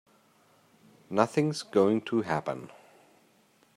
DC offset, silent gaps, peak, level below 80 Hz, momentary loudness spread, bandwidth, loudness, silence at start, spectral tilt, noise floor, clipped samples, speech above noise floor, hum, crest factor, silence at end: under 0.1%; none; -8 dBFS; -74 dBFS; 13 LU; 15 kHz; -28 LUFS; 1.1 s; -6 dB/octave; -65 dBFS; under 0.1%; 37 dB; none; 24 dB; 1.1 s